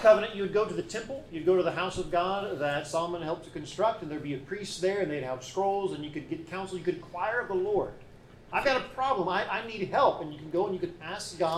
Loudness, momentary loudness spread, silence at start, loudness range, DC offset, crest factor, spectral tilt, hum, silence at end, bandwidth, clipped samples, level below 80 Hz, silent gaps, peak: -30 LUFS; 11 LU; 0 s; 3 LU; under 0.1%; 22 dB; -5 dB/octave; none; 0 s; 13.5 kHz; under 0.1%; -56 dBFS; none; -8 dBFS